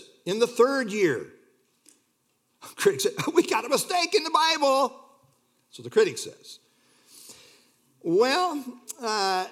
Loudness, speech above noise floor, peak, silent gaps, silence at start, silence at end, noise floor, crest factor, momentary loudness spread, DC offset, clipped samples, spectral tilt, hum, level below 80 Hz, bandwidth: -24 LUFS; 47 dB; -8 dBFS; none; 0.25 s; 0 s; -71 dBFS; 20 dB; 20 LU; under 0.1%; under 0.1%; -3 dB/octave; none; -82 dBFS; 17 kHz